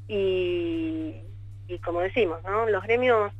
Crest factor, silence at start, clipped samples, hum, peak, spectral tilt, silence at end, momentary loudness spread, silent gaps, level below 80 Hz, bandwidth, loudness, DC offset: 14 dB; 0 s; under 0.1%; none; -12 dBFS; -7.5 dB/octave; 0 s; 17 LU; none; -48 dBFS; 8.2 kHz; -26 LUFS; under 0.1%